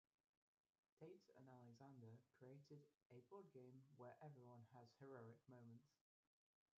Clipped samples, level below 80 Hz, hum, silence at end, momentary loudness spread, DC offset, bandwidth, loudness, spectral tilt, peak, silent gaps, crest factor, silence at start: under 0.1%; under -90 dBFS; none; 0.85 s; 5 LU; under 0.1%; 7 kHz; -66 LUFS; -7.5 dB/octave; -48 dBFS; 3.06-3.10 s; 18 dB; 0.95 s